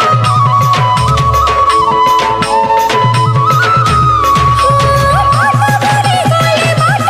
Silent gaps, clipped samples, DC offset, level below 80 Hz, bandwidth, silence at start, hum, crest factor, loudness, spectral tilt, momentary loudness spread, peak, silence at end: none; under 0.1%; under 0.1%; -26 dBFS; 15.5 kHz; 0 s; none; 8 dB; -9 LUFS; -5 dB/octave; 2 LU; 0 dBFS; 0 s